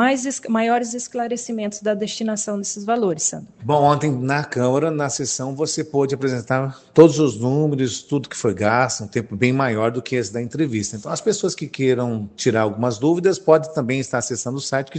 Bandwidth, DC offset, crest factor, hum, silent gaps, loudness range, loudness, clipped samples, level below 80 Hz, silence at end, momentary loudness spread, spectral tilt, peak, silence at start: 9.2 kHz; under 0.1%; 20 dB; none; none; 3 LU; -20 LUFS; under 0.1%; -62 dBFS; 0 s; 8 LU; -5 dB/octave; 0 dBFS; 0 s